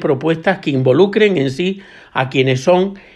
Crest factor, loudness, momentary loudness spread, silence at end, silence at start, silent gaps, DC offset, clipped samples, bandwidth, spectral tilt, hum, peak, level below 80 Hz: 14 dB; -15 LUFS; 9 LU; 0.15 s; 0 s; none; under 0.1%; under 0.1%; 10 kHz; -6.5 dB/octave; none; 0 dBFS; -54 dBFS